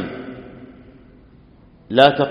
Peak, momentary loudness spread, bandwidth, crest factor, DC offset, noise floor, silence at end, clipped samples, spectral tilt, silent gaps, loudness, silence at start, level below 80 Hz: 0 dBFS; 27 LU; 5.6 kHz; 20 dB; under 0.1%; -48 dBFS; 0 s; under 0.1%; -3 dB/octave; none; -16 LUFS; 0 s; -52 dBFS